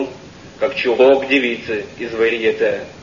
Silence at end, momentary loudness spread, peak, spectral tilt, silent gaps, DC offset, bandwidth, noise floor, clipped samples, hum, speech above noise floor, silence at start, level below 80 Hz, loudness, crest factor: 0 s; 12 LU; -2 dBFS; -5 dB/octave; none; under 0.1%; 7.4 kHz; -37 dBFS; under 0.1%; none; 21 dB; 0 s; -52 dBFS; -17 LUFS; 16 dB